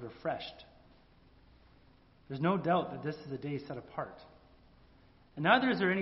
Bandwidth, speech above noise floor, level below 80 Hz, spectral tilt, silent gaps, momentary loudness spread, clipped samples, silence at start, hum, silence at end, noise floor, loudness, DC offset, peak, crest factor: 5.8 kHz; 30 dB; -66 dBFS; -4 dB/octave; none; 19 LU; under 0.1%; 0 s; none; 0 s; -63 dBFS; -33 LUFS; under 0.1%; -10 dBFS; 26 dB